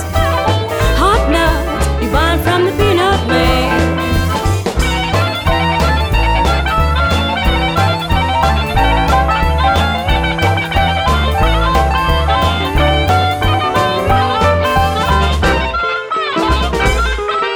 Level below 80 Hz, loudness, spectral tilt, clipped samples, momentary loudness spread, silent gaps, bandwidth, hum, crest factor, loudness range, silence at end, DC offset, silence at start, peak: -18 dBFS; -13 LUFS; -5.5 dB/octave; under 0.1%; 3 LU; none; over 20 kHz; none; 12 dB; 1 LU; 0 s; under 0.1%; 0 s; -2 dBFS